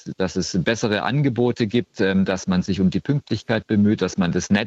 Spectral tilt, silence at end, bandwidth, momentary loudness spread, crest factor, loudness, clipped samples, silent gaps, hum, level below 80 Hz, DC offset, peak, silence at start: -6 dB/octave; 0 s; 8 kHz; 5 LU; 16 dB; -21 LUFS; under 0.1%; none; none; -50 dBFS; under 0.1%; -4 dBFS; 0.05 s